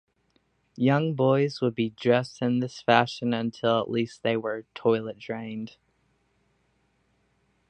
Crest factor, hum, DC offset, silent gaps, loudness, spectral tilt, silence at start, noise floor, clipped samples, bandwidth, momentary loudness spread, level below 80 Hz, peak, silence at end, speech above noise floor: 24 dB; none; under 0.1%; none; -26 LUFS; -7 dB/octave; 0.8 s; -70 dBFS; under 0.1%; 9 kHz; 12 LU; -70 dBFS; -2 dBFS; 2 s; 44 dB